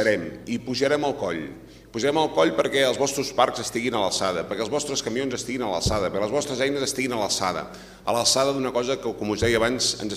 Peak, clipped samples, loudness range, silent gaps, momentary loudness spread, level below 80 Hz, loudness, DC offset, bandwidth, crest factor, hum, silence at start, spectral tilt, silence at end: -4 dBFS; under 0.1%; 2 LU; none; 8 LU; -48 dBFS; -24 LUFS; under 0.1%; 15.5 kHz; 20 dB; none; 0 s; -3.5 dB/octave; 0 s